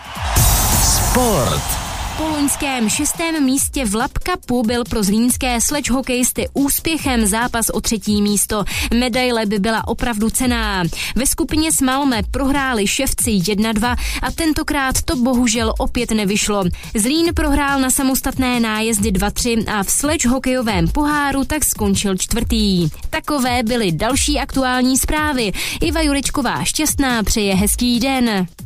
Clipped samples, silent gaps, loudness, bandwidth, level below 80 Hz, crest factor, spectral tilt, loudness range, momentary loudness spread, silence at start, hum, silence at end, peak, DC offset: under 0.1%; none; -17 LUFS; 15.5 kHz; -28 dBFS; 16 dB; -3.5 dB/octave; 1 LU; 4 LU; 0 s; none; 0 s; -2 dBFS; under 0.1%